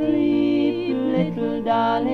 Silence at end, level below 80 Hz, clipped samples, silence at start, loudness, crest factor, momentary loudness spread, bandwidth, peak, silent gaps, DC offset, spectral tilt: 0 s; -52 dBFS; under 0.1%; 0 s; -21 LUFS; 12 dB; 4 LU; 5.8 kHz; -8 dBFS; none; under 0.1%; -8.5 dB/octave